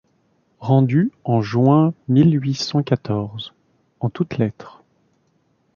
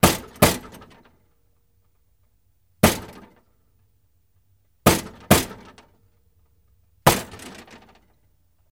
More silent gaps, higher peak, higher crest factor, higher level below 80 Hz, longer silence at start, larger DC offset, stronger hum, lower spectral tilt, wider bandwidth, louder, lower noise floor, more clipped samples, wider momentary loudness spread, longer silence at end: neither; about the same, -2 dBFS vs 0 dBFS; second, 18 dB vs 26 dB; second, -56 dBFS vs -44 dBFS; first, 0.6 s vs 0.05 s; neither; neither; first, -8 dB/octave vs -4 dB/octave; second, 7.2 kHz vs 17 kHz; about the same, -19 LUFS vs -21 LUFS; about the same, -64 dBFS vs -66 dBFS; neither; second, 13 LU vs 23 LU; second, 1.05 s vs 1.2 s